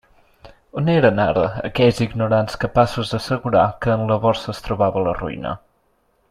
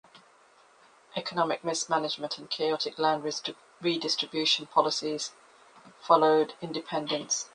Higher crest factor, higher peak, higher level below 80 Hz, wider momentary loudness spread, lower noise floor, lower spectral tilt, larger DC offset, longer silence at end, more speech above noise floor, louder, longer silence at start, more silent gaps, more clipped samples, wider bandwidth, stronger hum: second, 18 dB vs 24 dB; first, -2 dBFS vs -6 dBFS; first, -42 dBFS vs -76 dBFS; about the same, 10 LU vs 11 LU; about the same, -63 dBFS vs -60 dBFS; first, -7 dB/octave vs -2.5 dB/octave; neither; first, 0.75 s vs 0.05 s; first, 45 dB vs 31 dB; first, -19 LUFS vs -28 LUFS; first, 0.45 s vs 0.15 s; neither; neither; first, 13.5 kHz vs 10 kHz; neither